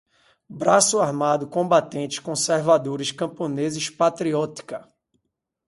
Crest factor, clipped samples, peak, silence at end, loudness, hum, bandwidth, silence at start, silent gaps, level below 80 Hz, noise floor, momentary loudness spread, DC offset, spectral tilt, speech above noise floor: 20 dB; under 0.1%; -4 dBFS; 0.85 s; -22 LUFS; none; 11.5 kHz; 0.5 s; none; -68 dBFS; -78 dBFS; 11 LU; under 0.1%; -3.5 dB/octave; 56 dB